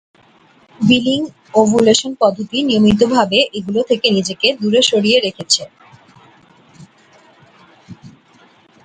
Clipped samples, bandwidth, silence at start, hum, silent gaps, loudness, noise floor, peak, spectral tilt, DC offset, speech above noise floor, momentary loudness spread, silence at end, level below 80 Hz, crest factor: under 0.1%; 10.5 kHz; 0.8 s; none; none; -14 LUFS; -50 dBFS; 0 dBFS; -4 dB/octave; under 0.1%; 36 dB; 7 LU; 0.75 s; -50 dBFS; 16 dB